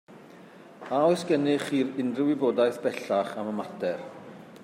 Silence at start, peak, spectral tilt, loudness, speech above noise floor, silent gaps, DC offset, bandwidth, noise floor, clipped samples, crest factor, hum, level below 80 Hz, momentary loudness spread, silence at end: 0.1 s; -10 dBFS; -6 dB/octave; -27 LUFS; 23 dB; none; under 0.1%; 15.5 kHz; -49 dBFS; under 0.1%; 16 dB; none; -78 dBFS; 15 LU; 0 s